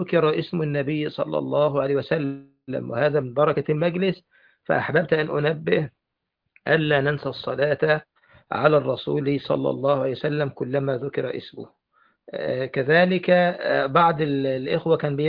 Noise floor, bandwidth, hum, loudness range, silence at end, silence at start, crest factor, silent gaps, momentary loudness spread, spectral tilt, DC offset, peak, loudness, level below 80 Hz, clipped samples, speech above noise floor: -81 dBFS; 5.2 kHz; none; 3 LU; 0 s; 0 s; 20 dB; none; 11 LU; -9.5 dB/octave; under 0.1%; -2 dBFS; -23 LUFS; -60 dBFS; under 0.1%; 59 dB